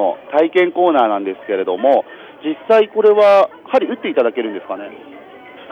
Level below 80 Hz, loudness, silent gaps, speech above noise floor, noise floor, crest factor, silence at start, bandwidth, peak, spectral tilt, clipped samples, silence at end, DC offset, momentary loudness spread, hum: -74 dBFS; -15 LUFS; none; 23 dB; -38 dBFS; 14 dB; 0 s; 6.6 kHz; -2 dBFS; -6 dB/octave; under 0.1%; 0.05 s; under 0.1%; 15 LU; none